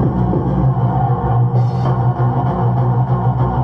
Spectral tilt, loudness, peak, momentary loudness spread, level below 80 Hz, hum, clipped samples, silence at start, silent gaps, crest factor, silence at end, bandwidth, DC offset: -11 dB/octave; -16 LUFS; -6 dBFS; 1 LU; -30 dBFS; none; under 0.1%; 0 s; none; 10 dB; 0 s; 4.5 kHz; under 0.1%